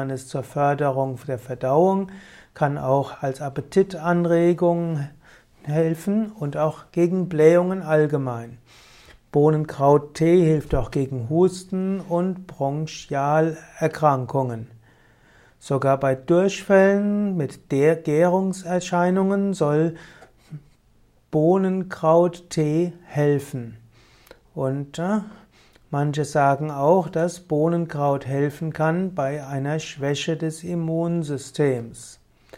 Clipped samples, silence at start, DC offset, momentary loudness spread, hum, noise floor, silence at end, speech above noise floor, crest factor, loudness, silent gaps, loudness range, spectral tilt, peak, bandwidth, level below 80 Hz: under 0.1%; 0 s; under 0.1%; 11 LU; none; -58 dBFS; 0.45 s; 37 dB; 18 dB; -22 LUFS; none; 5 LU; -7 dB/octave; -4 dBFS; 15 kHz; -48 dBFS